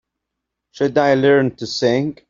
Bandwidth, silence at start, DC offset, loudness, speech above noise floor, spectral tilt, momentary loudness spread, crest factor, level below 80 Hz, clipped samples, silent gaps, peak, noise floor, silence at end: 7.6 kHz; 0.75 s; under 0.1%; -17 LUFS; 63 dB; -6 dB/octave; 7 LU; 16 dB; -56 dBFS; under 0.1%; none; -2 dBFS; -80 dBFS; 0.2 s